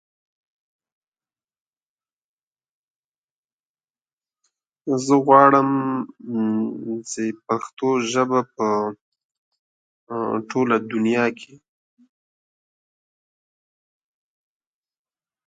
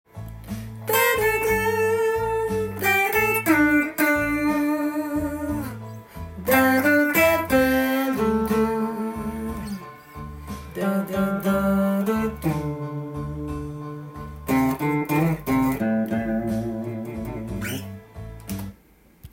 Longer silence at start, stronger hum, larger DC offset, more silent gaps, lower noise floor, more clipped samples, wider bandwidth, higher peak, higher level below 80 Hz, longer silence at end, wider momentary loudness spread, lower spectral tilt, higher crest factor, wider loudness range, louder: first, 4.85 s vs 0.15 s; neither; neither; first, 7.73-7.77 s, 9.01-9.12 s, 9.24-9.52 s, 9.59-10.07 s vs none; first, under -90 dBFS vs -54 dBFS; neither; second, 9.4 kHz vs 17 kHz; first, 0 dBFS vs -6 dBFS; second, -76 dBFS vs -44 dBFS; first, 4.05 s vs 0.05 s; second, 14 LU vs 17 LU; about the same, -5.5 dB/octave vs -5.5 dB/octave; first, 24 dB vs 18 dB; about the same, 7 LU vs 6 LU; about the same, -21 LUFS vs -23 LUFS